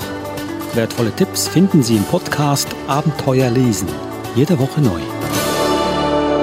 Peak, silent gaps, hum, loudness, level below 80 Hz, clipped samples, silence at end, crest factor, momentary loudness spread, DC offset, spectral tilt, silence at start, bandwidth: -2 dBFS; none; none; -17 LUFS; -42 dBFS; under 0.1%; 0 s; 14 dB; 8 LU; under 0.1%; -5.5 dB/octave; 0 s; 16.5 kHz